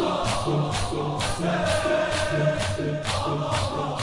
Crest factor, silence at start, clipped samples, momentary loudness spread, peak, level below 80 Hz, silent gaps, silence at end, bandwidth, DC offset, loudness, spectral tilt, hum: 14 dB; 0 s; under 0.1%; 3 LU; -10 dBFS; -42 dBFS; none; 0 s; 11.5 kHz; under 0.1%; -25 LUFS; -5 dB/octave; none